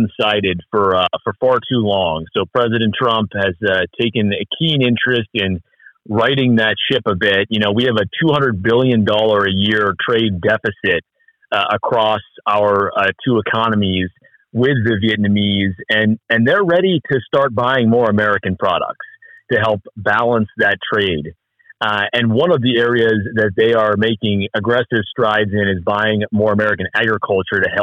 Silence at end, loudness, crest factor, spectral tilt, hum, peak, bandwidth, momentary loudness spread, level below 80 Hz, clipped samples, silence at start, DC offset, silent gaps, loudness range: 0 s; -16 LUFS; 12 dB; -7.5 dB/octave; none; -4 dBFS; 7.2 kHz; 5 LU; -54 dBFS; under 0.1%; 0 s; under 0.1%; none; 2 LU